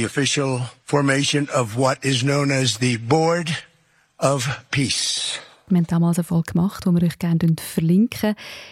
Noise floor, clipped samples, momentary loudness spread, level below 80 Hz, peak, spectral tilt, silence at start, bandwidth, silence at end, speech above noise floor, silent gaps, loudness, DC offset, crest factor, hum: -60 dBFS; under 0.1%; 6 LU; -54 dBFS; -4 dBFS; -5 dB/octave; 0 s; 15.5 kHz; 0 s; 40 dB; none; -20 LUFS; under 0.1%; 18 dB; none